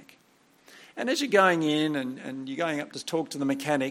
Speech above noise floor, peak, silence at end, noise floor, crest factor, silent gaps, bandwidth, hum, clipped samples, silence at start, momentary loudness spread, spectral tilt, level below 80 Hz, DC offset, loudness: 35 dB; -8 dBFS; 0 s; -62 dBFS; 20 dB; none; 16.5 kHz; none; under 0.1%; 0 s; 14 LU; -4.5 dB/octave; -78 dBFS; under 0.1%; -27 LUFS